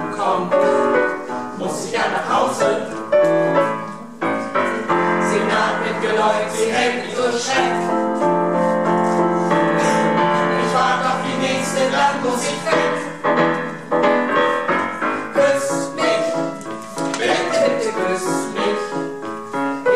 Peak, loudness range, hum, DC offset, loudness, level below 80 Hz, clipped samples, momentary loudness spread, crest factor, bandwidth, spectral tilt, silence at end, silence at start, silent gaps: -4 dBFS; 2 LU; none; 0.6%; -18 LUFS; -62 dBFS; under 0.1%; 7 LU; 14 dB; 13.5 kHz; -4.5 dB/octave; 0 s; 0 s; none